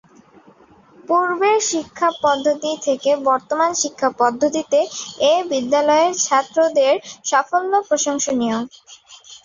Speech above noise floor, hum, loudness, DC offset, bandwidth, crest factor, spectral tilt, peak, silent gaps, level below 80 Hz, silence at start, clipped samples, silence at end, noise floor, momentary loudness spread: 31 dB; none; -18 LUFS; under 0.1%; 7.6 kHz; 16 dB; -2 dB/octave; -2 dBFS; none; -64 dBFS; 1.1 s; under 0.1%; 0.1 s; -49 dBFS; 5 LU